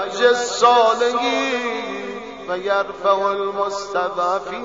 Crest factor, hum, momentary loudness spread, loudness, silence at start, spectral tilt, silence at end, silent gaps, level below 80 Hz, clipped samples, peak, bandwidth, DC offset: 16 dB; none; 12 LU; -19 LUFS; 0 s; -2.5 dB/octave; 0 s; none; -60 dBFS; under 0.1%; -2 dBFS; 7.8 kHz; 0.2%